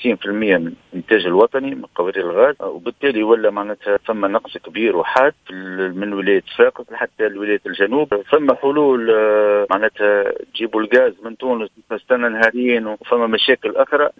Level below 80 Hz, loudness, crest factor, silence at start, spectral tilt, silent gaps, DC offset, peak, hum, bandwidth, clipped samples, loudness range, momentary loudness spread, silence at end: -60 dBFS; -17 LUFS; 16 dB; 0 s; -6.5 dB/octave; none; under 0.1%; 0 dBFS; none; 7.2 kHz; under 0.1%; 3 LU; 9 LU; 0.1 s